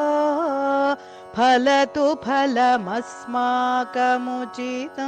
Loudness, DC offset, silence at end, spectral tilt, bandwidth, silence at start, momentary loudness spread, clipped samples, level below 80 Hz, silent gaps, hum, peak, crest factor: -21 LUFS; under 0.1%; 0 s; -4 dB/octave; 9.4 kHz; 0 s; 11 LU; under 0.1%; -64 dBFS; none; none; -10 dBFS; 12 dB